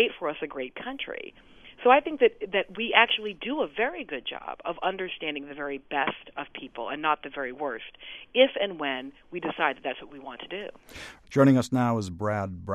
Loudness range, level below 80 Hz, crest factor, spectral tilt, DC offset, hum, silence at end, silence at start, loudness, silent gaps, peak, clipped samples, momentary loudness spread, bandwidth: 7 LU; -60 dBFS; 24 dB; -5.5 dB/octave; under 0.1%; none; 0 s; 0 s; -27 LUFS; none; -4 dBFS; under 0.1%; 17 LU; 12.5 kHz